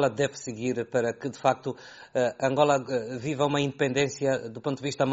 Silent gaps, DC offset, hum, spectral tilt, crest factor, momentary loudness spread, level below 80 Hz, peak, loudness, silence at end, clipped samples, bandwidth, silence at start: none; under 0.1%; none; -4.5 dB/octave; 20 dB; 9 LU; -66 dBFS; -6 dBFS; -28 LUFS; 0 s; under 0.1%; 8 kHz; 0 s